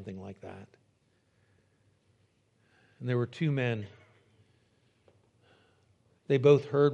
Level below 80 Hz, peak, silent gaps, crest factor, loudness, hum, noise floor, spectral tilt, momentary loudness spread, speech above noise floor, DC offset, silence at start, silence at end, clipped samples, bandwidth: -80 dBFS; -10 dBFS; none; 24 dB; -28 LUFS; none; -71 dBFS; -8 dB/octave; 24 LU; 43 dB; under 0.1%; 0 s; 0 s; under 0.1%; 7.4 kHz